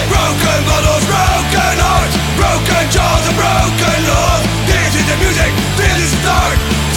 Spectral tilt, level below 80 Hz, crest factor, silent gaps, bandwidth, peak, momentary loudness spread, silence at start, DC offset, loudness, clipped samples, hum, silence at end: -4 dB/octave; -20 dBFS; 12 dB; none; 19 kHz; 0 dBFS; 1 LU; 0 s; under 0.1%; -12 LUFS; under 0.1%; none; 0 s